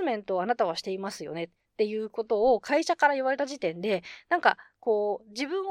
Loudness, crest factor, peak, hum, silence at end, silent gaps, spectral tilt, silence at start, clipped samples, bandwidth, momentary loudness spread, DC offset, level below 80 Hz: -28 LUFS; 20 dB; -8 dBFS; none; 0 s; none; -4 dB/octave; 0 s; under 0.1%; 13 kHz; 10 LU; under 0.1%; -66 dBFS